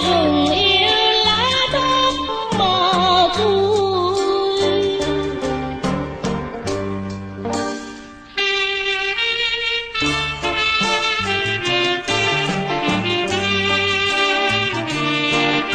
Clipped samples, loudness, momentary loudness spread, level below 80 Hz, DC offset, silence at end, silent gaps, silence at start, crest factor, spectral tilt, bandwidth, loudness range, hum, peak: under 0.1%; -17 LUFS; 10 LU; -42 dBFS; under 0.1%; 0 s; none; 0 s; 16 dB; -4 dB/octave; 10 kHz; 7 LU; none; -4 dBFS